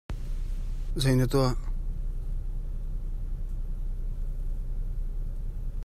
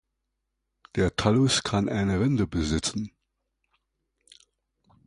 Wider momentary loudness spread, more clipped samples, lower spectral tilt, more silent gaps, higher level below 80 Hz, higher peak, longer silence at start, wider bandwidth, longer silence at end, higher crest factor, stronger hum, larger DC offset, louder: about the same, 13 LU vs 11 LU; neither; first, -6.5 dB/octave vs -5 dB/octave; neither; first, -30 dBFS vs -44 dBFS; second, -12 dBFS vs -6 dBFS; second, 0.1 s vs 0.95 s; first, 14 kHz vs 11 kHz; second, 0 s vs 2 s; about the same, 18 dB vs 22 dB; neither; neither; second, -33 LUFS vs -25 LUFS